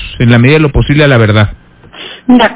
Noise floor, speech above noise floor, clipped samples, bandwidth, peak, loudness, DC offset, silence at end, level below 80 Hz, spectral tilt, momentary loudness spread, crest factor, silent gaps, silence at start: -30 dBFS; 24 dB; 3%; 4 kHz; 0 dBFS; -7 LUFS; under 0.1%; 0 s; -24 dBFS; -11 dB/octave; 14 LU; 8 dB; none; 0 s